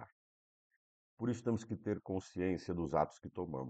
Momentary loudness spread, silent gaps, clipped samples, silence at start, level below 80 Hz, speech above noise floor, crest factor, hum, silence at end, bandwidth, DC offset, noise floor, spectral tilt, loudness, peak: 7 LU; 0.12-0.70 s, 0.76-1.17 s; under 0.1%; 0 s; -64 dBFS; over 52 dB; 22 dB; none; 0 s; 8.8 kHz; under 0.1%; under -90 dBFS; -7.5 dB/octave; -39 LUFS; -18 dBFS